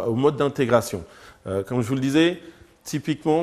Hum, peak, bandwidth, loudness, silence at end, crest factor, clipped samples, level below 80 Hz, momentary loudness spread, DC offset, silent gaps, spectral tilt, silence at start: none; -4 dBFS; 14.5 kHz; -23 LUFS; 0 s; 20 dB; under 0.1%; -56 dBFS; 15 LU; under 0.1%; none; -6 dB/octave; 0 s